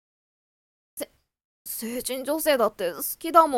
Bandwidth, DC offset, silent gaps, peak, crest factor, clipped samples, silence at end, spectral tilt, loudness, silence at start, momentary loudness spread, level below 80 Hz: 18 kHz; under 0.1%; 1.45-1.65 s; -4 dBFS; 24 dB; under 0.1%; 0 s; -2.5 dB/octave; -25 LUFS; 0.95 s; 19 LU; -64 dBFS